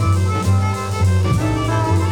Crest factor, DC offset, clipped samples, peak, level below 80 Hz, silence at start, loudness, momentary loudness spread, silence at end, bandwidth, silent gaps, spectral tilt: 10 dB; under 0.1%; under 0.1%; -6 dBFS; -34 dBFS; 0 s; -18 LUFS; 2 LU; 0 s; 13 kHz; none; -6.5 dB/octave